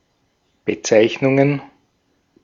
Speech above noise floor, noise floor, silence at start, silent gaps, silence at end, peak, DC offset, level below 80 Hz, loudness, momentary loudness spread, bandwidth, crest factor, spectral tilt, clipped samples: 49 dB; -65 dBFS; 0.65 s; none; 0.75 s; -2 dBFS; under 0.1%; -64 dBFS; -17 LUFS; 12 LU; 7.6 kHz; 18 dB; -5.5 dB/octave; under 0.1%